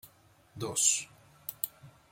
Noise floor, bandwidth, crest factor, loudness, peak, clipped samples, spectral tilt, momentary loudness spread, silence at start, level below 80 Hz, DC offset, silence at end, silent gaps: -62 dBFS; 17 kHz; 24 dB; -30 LUFS; -10 dBFS; under 0.1%; -1 dB/octave; 18 LU; 0.05 s; -72 dBFS; under 0.1%; 0.2 s; none